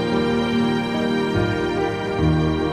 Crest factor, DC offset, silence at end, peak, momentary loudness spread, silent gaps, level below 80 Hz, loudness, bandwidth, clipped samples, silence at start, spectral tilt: 12 dB; under 0.1%; 0 s; -8 dBFS; 3 LU; none; -36 dBFS; -21 LUFS; 11.5 kHz; under 0.1%; 0 s; -7 dB/octave